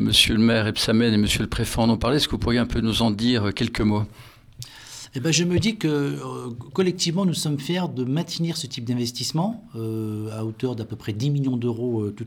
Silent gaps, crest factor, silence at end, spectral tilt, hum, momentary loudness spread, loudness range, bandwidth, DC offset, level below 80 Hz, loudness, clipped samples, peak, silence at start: none; 20 dB; 0 s; -5 dB/octave; none; 12 LU; 6 LU; 17.5 kHz; under 0.1%; -42 dBFS; -23 LUFS; under 0.1%; -2 dBFS; 0 s